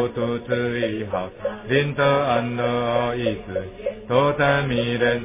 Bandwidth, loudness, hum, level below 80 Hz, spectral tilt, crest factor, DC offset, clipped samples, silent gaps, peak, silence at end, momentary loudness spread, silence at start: 3.8 kHz; -22 LUFS; none; -46 dBFS; -10 dB/octave; 16 dB; under 0.1%; under 0.1%; none; -6 dBFS; 0 s; 10 LU; 0 s